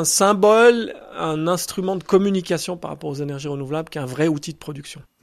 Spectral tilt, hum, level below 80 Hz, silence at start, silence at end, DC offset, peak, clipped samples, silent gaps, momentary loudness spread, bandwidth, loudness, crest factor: -4.5 dB/octave; none; -56 dBFS; 0 s; 0.2 s; under 0.1%; -2 dBFS; under 0.1%; none; 17 LU; 15.5 kHz; -20 LUFS; 18 dB